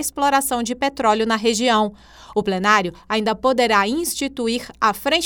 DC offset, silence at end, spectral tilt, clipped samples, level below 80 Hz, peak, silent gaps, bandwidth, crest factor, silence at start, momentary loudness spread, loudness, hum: under 0.1%; 0 s; -3 dB/octave; under 0.1%; -50 dBFS; -2 dBFS; none; over 20 kHz; 18 dB; 0 s; 7 LU; -19 LUFS; none